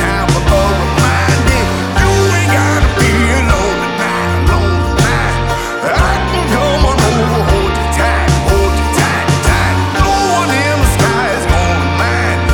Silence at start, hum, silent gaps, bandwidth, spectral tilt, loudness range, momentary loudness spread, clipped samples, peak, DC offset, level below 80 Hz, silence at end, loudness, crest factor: 0 s; none; none; 18 kHz; -5 dB/octave; 1 LU; 3 LU; under 0.1%; 0 dBFS; under 0.1%; -18 dBFS; 0 s; -12 LUFS; 12 dB